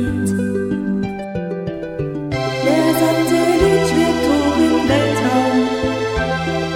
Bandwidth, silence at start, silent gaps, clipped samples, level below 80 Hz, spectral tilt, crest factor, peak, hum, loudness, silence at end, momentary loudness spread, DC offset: 16.5 kHz; 0 s; none; under 0.1%; -36 dBFS; -5.5 dB/octave; 14 dB; -2 dBFS; none; -17 LUFS; 0 s; 10 LU; under 0.1%